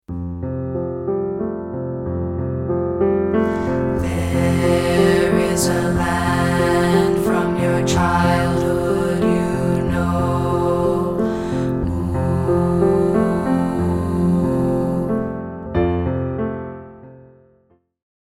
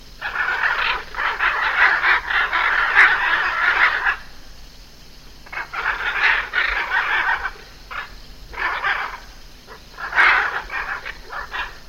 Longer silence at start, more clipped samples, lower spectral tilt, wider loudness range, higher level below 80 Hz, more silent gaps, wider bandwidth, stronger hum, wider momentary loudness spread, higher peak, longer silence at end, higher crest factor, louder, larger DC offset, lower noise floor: about the same, 0.1 s vs 0 s; neither; first, -6.5 dB/octave vs -1.5 dB/octave; about the same, 5 LU vs 6 LU; first, -36 dBFS vs -42 dBFS; neither; about the same, 16 kHz vs 16 kHz; neither; second, 9 LU vs 17 LU; about the same, -2 dBFS vs 0 dBFS; first, 1 s vs 0 s; about the same, 16 dB vs 20 dB; about the same, -19 LUFS vs -18 LUFS; neither; first, -59 dBFS vs -41 dBFS